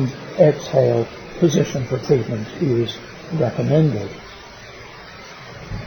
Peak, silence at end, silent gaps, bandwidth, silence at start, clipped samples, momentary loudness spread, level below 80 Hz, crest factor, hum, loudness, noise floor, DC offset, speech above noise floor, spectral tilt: -2 dBFS; 0 s; none; 19 kHz; 0 s; under 0.1%; 21 LU; -46 dBFS; 18 dB; none; -19 LUFS; -38 dBFS; under 0.1%; 20 dB; -7 dB/octave